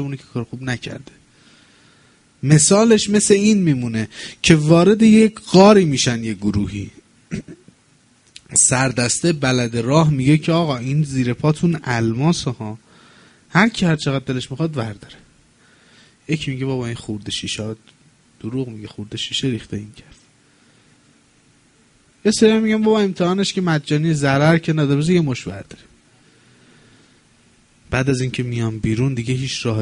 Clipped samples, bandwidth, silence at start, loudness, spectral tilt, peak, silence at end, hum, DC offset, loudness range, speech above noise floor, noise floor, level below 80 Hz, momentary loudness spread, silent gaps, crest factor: under 0.1%; 10.5 kHz; 0 s; -17 LUFS; -5 dB/octave; 0 dBFS; 0 s; none; under 0.1%; 13 LU; 38 dB; -55 dBFS; -48 dBFS; 18 LU; none; 18 dB